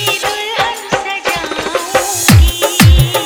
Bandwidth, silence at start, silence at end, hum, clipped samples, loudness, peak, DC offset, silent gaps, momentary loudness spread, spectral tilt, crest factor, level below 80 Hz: over 20 kHz; 0 s; 0 s; none; 0.3%; -12 LUFS; 0 dBFS; under 0.1%; none; 9 LU; -4 dB/octave; 12 dB; -18 dBFS